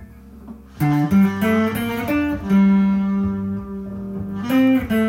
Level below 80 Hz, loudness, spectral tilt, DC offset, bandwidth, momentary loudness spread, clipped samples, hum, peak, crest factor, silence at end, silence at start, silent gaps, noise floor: -44 dBFS; -19 LUFS; -7.5 dB/octave; under 0.1%; 16.5 kHz; 14 LU; under 0.1%; none; -6 dBFS; 12 dB; 0 s; 0 s; none; -40 dBFS